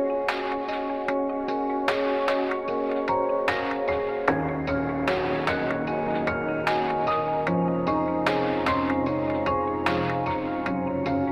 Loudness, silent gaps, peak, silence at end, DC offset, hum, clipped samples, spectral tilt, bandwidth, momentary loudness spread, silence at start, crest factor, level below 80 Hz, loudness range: -26 LUFS; none; -6 dBFS; 0 s; under 0.1%; none; under 0.1%; -7 dB/octave; 12 kHz; 3 LU; 0 s; 20 dB; -50 dBFS; 1 LU